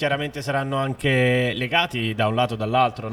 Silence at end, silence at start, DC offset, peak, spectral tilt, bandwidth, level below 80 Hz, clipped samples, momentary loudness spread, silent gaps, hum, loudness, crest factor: 0 s; 0 s; under 0.1%; -4 dBFS; -6 dB/octave; 15.5 kHz; -52 dBFS; under 0.1%; 6 LU; none; none; -22 LUFS; 18 dB